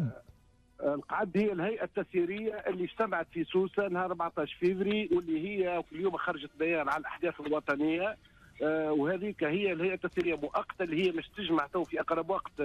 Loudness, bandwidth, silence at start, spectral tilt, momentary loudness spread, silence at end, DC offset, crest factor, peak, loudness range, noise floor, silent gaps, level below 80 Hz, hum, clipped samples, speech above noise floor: -32 LUFS; 9.2 kHz; 0 s; -7.5 dB/octave; 5 LU; 0 s; under 0.1%; 14 dB; -18 dBFS; 1 LU; -61 dBFS; none; -64 dBFS; none; under 0.1%; 29 dB